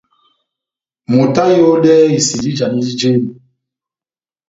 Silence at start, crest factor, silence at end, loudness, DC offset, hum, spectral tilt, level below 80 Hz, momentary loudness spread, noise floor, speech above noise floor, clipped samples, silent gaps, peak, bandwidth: 1.1 s; 14 dB; 1.15 s; -12 LUFS; under 0.1%; none; -5.5 dB/octave; -54 dBFS; 8 LU; under -90 dBFS; over 79 dB; under 0.1%; none; 0 dBFS; 7.8 kHz